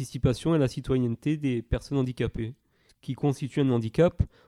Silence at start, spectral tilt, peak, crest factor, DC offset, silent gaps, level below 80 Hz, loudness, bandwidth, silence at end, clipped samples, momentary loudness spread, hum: 0 s; -7.5 dB/octave; -10 dBFS; 18 dB; under 0.1%; none; -42 dBFS; -27 LUFS; 12.5 kHz; 0.2 s; under 0.1%; 8 LU; none